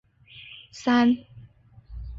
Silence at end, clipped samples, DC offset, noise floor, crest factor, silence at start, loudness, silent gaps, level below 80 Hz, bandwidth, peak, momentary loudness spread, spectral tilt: 0 s; under 0.1%; under 0.1%; -51 dBFS; 16 dB; 0.75 s; -23 LUFS; none; -46 dBFS; 7.6 kHz; -10 dBFS; 24 LU; -5.5 dB/octave